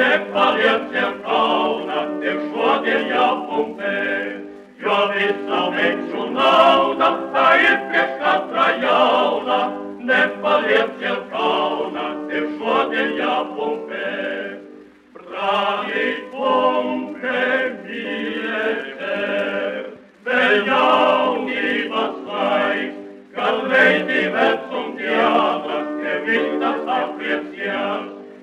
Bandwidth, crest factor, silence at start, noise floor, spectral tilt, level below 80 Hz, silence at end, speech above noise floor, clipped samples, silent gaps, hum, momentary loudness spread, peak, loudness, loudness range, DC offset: 11 kHz; 18 dB; 0 s; -43 dBFS; -5 dB/octave; -68 dBFS; 0 s; 24 dB; under 0.1%; none; none; 10 LU; -2 dBFS; -19 LUFS; 6 LU; under 0.1%